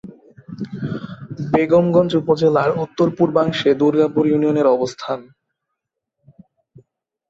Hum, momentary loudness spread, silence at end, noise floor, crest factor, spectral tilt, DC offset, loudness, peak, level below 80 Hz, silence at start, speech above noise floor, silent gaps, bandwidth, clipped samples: none; 15 LU; 2.1 s; -79 dBFS; 16 dB; -7.5 dB/octave; under 0.1%; -17 LUFS; -2 dBFS; -56 dBFS; 0.05 s; 63 dB; none; 7.8 kHz; under 0.1%